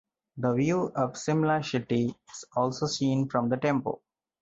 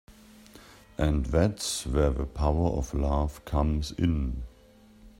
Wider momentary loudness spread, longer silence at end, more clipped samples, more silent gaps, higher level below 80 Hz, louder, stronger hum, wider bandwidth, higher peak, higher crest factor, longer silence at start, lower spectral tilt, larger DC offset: about the same, 7 LU vs 6 LU; first, 0.45 s vs 0.1 s; neither; neither; second, -64 dBFS vs -34 dBFS; about the same, -28 LUFS vs -28 LUFS; neither; second, 8 kHz vs 15.5 kHz; about the same, -12 dBFS vs -10 dBFS; about the same, 16 dB vs 20 dB; first, 0.35 s vs 0.1 s; about the same, -6 dB/octave vs -6 dB/octave; neither